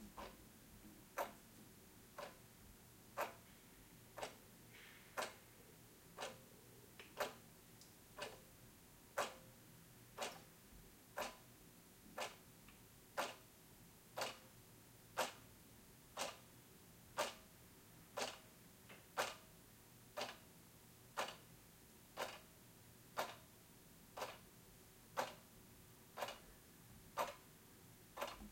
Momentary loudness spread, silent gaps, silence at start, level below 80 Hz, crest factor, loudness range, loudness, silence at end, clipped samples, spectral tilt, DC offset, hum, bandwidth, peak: 16 LU; none; 0 s; -74 dBFS; 28 dB; 4 LU; -51 LUFS; 0 s; under 0.1%; -2.5 dB/octave; under 0.1%; none; 16.5 kHz; -26 dBFS